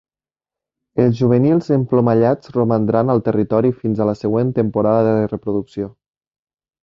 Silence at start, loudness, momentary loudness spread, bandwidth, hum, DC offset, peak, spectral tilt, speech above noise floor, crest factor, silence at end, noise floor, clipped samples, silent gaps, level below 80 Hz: 0.95 s; -17 LUFS; 8 LU; 7.2 kHz; none; under 0.1%; -2 dBFS; -10 dB/octave; over 74 dB; 16 dB; 0.95 s; under -90 dBFS; under 0.1%; none; -52 dBFS